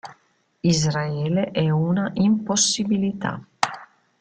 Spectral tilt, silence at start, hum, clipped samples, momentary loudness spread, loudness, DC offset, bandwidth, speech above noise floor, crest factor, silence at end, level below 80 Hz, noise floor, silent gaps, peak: -4.5 dB/octave; 0.05 s; none; under 0.1%; 7 LU; -22 LUFS; under 0.1%; 9.4 kHz; 42 dB; 22 dB; 0.35 s; -56 dBFS; -64 dBFS; none; 0 dBFS